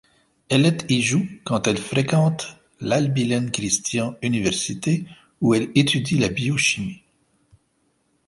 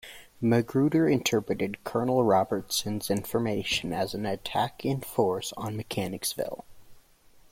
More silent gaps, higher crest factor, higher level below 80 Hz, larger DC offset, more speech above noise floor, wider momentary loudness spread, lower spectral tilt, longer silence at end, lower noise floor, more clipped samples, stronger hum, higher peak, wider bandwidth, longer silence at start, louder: neither; about the same, 20 dB vs 18 dB; about the same, -54 dBFS vs -58 dBFS; neither; first, 46 dB vs 29 dB; about the same, 7 LU vs 9 LU; about the same, -4.5 dB/octave vs -5 dB/octave; first, 1.35 s vs 0.55 s; first, -67 dBFS vs -57 dBFS; neither; neither; first, -2 dBFS vs -10 dBFS; second, 11.5 kHz vs 16.5 kHz; first, 0.5 s vs 0.05 s; first, -21 LUFS vs -28 LUFS